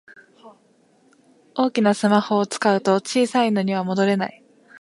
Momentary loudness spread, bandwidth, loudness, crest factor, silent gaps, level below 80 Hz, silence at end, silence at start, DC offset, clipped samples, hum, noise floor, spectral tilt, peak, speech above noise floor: 5 LU; 11.5 kHz; -20 LUFS; 18 dB; none; -72 dBFS; 0.5 s; 0.45 s; under 0.1%; under 0.1%; none; -59 dBFS; -5.5 dB/octave; -4 dBFS; 39 dB